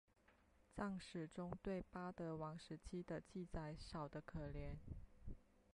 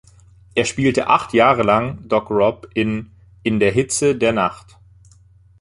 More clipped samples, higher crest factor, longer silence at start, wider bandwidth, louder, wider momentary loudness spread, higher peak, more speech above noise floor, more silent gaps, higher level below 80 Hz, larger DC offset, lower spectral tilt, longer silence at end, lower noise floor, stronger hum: neither; about the same, 18 dB vs 18 dB; second, 0.3 s vs 0.55 s; about the same, 11 kHz vs 11.5 kHz; second, -52 LUFS vs -18 LUFS; about the same, 10 LU vs 9 LU; second, -34 dBFS vs -2 dBFS; second, 24 dB vs 32 dB; neither; second, -62 dBFS vs -48 dBFS; neither; first, -7 dB/octave vs -5 dB/octave; second, 0.15 s vs 1 s; first, -75 dBFS vs -50 dBFS; neither